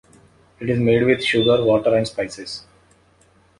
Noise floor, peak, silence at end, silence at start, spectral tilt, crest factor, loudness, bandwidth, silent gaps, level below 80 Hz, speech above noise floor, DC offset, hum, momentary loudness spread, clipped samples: -56 dBFS; -4 dBFS; 1 s; 0.6 s; -6 dB/octave; 16 dB; -18 LUFS; 11.5 kHz; none; -52 dBFS; 38 dB; under 0.1%; none; 15 LU; under 0.1%